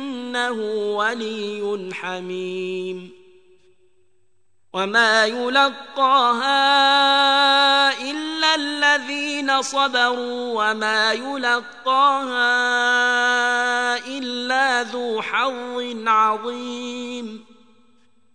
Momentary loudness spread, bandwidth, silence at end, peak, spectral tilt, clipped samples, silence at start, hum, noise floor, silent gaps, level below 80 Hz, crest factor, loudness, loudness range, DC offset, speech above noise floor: 13 LU; 10 kHz; 0.95 s; -4 dBFS; -2 dB/octave; under 0.1%; 0 s; none; -72 dBFS; none; -74 dBFS; 18 dB; -19 LUFS; 10 LU; 0.2%; 52 dB